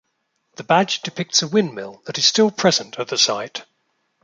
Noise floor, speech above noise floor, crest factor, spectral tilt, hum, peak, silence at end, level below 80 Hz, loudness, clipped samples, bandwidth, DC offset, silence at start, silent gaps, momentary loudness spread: -71 dBFS; 52 dB; 20 dB; -3 dB/octave; none; -2 dBFS; 0.6 s; -66 dBFS; -18 LUFS; under 0.1%; 9.4 kHz; under 0.1%; 0.6 s; none; 15 LU